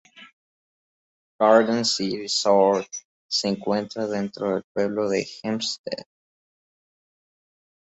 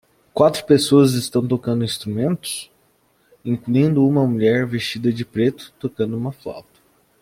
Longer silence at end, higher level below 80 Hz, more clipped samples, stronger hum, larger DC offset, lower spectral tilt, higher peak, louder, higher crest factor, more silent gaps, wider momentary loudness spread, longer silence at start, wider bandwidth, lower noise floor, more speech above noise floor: first, 1.9 s vs 0.6 s; second, -68 dBFS vs -58 dBFS; neither; neither; neither; second, -4 dB/octave vs -6 dB/octave; about the same, -2 dBFS vs -2 dBFS; second, -23 LUFS vs -19 LUFS; about the same, 22 dB vs 18 dB; first, 0.33-1.39 s, 3.05-3.29 s, 4.64-4.75 s, 5.79-5.84 s vs none; second, 12 LU vs 15 LU; second, 0.2 s vs 0.35 s; second, 8.2 kHz vs 16.5 kHz; first, under -90 dBFS vs -60 dBFS; first, over 67 dB vs 42 dB